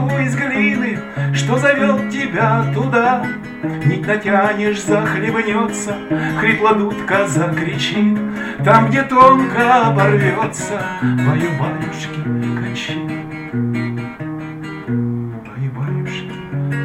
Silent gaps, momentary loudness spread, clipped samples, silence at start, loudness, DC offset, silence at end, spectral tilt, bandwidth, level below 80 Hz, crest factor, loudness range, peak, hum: none; 13 LU; under 0.1%; 0 s; -16 LUFS; under 0.1%; 0 s; -6 dB/octave; 13 kHz; -50 dBFS; 16 dB; 10 LU; 0 dBFS; none